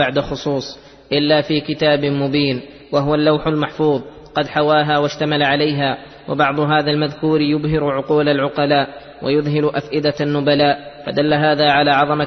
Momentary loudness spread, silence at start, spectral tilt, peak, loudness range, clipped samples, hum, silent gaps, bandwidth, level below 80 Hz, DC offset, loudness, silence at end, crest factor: 8 LU; 0 s; -6.5 dB/octave; -2 dBFS; 1 LU; under 0.1%; none; none; 6.4 kHz; -46 dBFS; under 0.1%; -17 LUFS; 0 s; 16 dB